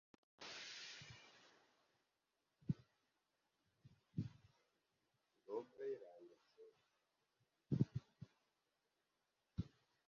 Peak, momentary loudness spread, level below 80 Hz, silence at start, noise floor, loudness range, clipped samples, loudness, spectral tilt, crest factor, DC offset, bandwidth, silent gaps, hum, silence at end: -24 dBFS; 23 LU; -72 dBFS; 0.4 s; -89 dBFS; 6 LU; under 0.1%; -50 LUFS; -6.5 dB/octave; 28 dB; under 0.1%; 7.2 kHz; none; none; 0.4 s